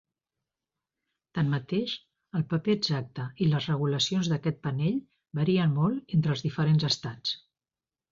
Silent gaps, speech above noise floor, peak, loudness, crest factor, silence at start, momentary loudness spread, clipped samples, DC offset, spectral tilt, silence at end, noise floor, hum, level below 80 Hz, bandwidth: none; over 63 dB; -14 dBFS; -28 LUFS; 16 dB; 1.35 s; 10 LU; under 0.1%; under 0.1%; -6 dB/octave; 0.75 s; under -90 dBFS; none; -64 dBFS; 7.6 kHz